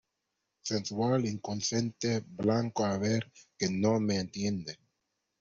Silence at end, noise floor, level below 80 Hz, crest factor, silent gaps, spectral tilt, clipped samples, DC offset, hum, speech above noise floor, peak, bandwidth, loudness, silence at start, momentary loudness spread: 0.65 s; -84 dBFS; -66 dBFS; 18 dB; none; -5 dB/octave; under 0.1%; under 0.1%; none; 53 dB; -14 dBFS; 8 kHz; -32 LUFS; 0.65 s; 8 LU